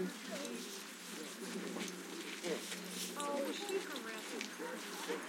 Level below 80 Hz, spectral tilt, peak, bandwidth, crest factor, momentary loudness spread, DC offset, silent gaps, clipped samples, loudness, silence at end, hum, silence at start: under -90 dBFS; -3 dB/octave; -24 dBFS; 16.5 kHz; 20 dB; 6 LU; under 0.1%; none; under 0.1%; -43 LUFS; 0 s; none; 0 s